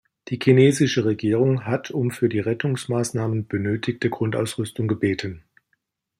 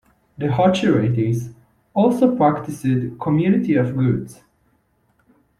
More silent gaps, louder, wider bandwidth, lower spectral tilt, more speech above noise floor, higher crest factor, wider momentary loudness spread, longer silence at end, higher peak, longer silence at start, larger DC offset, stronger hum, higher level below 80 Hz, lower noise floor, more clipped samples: neither; second, -22 LUFS vs -19 LUFS; first, 15.5 kHz vs 13 kHz; second, -6.5 dB/octave vs -8 dB/octave; first, 51 dB vs 45 dB; about the same, 18 dB vs 16 dB; about the same, 9 LU vs 10 LU; second, 0.8 s vs 1.25 s; about the same, -4 dBFS vs -4 dBFS; second, 0.25 s vs 0.4 s; neither; neither; second, -60 dBFS vs -54 dBFS; first, -72 dBFS vs -63 dBFS; neither